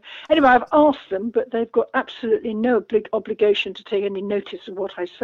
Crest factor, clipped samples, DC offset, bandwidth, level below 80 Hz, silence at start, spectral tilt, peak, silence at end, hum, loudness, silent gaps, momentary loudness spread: 16 dB; under 0.1%; under 0.1%; 7 kHz; -56 dBFS; 0.05 s; -6.5 dB/octave; -4 dBFS; 0.15 s; none; -21 LUFS; none; 12 LU